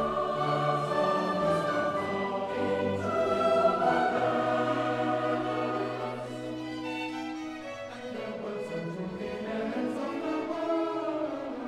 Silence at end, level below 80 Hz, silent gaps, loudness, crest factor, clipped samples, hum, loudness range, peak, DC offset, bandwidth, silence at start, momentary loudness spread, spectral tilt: 0 s; -64 dBFS; none; -30 LUFS; 16 dB; under 0.1%; none; 8 LU; -14 dBFS; under 0.1%; 13 kHz; 0 s; 11 LU; -6 dB/octave